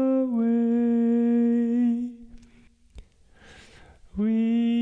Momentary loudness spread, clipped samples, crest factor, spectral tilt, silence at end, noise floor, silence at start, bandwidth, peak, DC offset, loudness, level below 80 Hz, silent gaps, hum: 8 LU; under 0.1%; 8 dB; -8.5 dB/octave; 0 s; -56 dBFS; 0 s; 3.8 kHz; -16 dBFS; under 0.1%; -23 LUFS; -56 dBFS; none; none